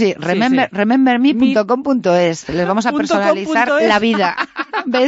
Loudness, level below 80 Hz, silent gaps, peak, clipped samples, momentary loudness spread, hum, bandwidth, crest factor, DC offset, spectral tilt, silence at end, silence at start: -15 LUFS; -52 dBFS; none; -2 dBFS; under 0.1%; 5 LU; none; 8 kHz; 12 dB; under 0.1%; -5.5 dB/octave; 0 s; 0 s